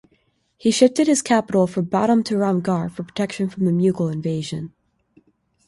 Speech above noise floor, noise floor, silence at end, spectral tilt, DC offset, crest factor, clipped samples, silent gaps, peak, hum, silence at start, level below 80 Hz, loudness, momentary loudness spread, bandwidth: 45 dB; -64 dBFS; 1 s; -5.5 dB/octave; under 0.1%; 18 dB; under 0.1%; none; -2 dBFS; none; 0.65 s; -60 dBFS; -20 LUFS; 10 LU; 11.5 kHz